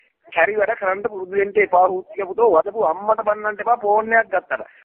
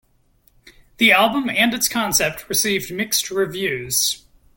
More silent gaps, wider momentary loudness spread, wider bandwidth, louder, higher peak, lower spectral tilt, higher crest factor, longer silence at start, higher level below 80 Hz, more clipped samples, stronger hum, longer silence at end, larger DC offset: neither; about the same, 8 LU vs 8 LU; second, 3.7 kHz vs 17 kHz; about the same, -19 LUFS vs -18 LUFS; about the same, -2 dBFS vs -2 dBFS; first, -8.5 dB/octave vs -2 dB/octave; about the same, 16 dB vs 18 dB; second, 0.3 s vs 1 s; second, -62 dBFS vs -52 dBFS; neither; neither; second, 0.2 s vs 0.4 s; neither